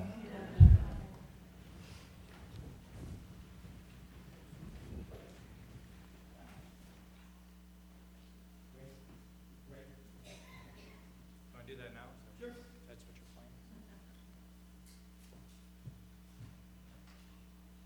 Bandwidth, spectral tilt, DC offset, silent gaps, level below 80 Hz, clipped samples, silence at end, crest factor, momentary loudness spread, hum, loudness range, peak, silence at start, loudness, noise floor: 18.5 kHz; -8 dB/octave; under 0.1%; none; -44 dBFS; under 0.1%; 1.4 s; 30 dB; 11 LU; none; 14 LU; -8 dBFS; 0 s; -31 LUFS; -58 dBFS